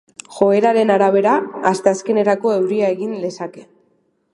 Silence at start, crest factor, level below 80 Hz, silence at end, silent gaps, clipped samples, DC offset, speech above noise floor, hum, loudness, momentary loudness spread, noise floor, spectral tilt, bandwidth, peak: 0.3 s; 16 dB; -68 dBFS; 0.7 s; none; under 0.1%; under 0.1%; 46 dB; none; -16 LUFS; 12 LU; -62 dBFS; -5.5 dB/octave; 11.5 kHz; 0 dBFS